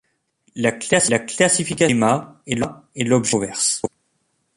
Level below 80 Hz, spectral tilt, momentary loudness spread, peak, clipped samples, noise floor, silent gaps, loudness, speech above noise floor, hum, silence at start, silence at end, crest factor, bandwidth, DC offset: -56 dBFS; -3.5 dB/octave; 10 LU; -2 dBFS; under 0.1%; -69 dBFS; none; -19 LUFS; 49 dB; none; 0.55 s; 0.7 s; 20 dB; 11.5 kHz; under 0.1%